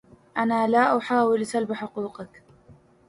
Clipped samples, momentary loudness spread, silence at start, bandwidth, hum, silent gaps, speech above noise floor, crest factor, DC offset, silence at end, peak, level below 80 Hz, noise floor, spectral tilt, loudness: under 0.1%; 15 LU; 0.35 s; 11.5 kHz; none; none; 31 dB; 18 dB; under 0.1%; 0.35 s; -8 dBFS; -68 dBFS; -54 dBFS; -5.5 dB/octave; -24 LUFS